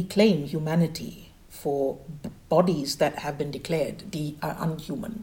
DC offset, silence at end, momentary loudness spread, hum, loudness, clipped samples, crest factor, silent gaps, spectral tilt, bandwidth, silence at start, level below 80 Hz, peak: under 0.1%; 0 s; 15 LU; none; -27 LUFS; under 0.1%; 20 dB; none; -6 dB/octave; 17 kHz; 0 s; -54 dBFS; -6 dBFS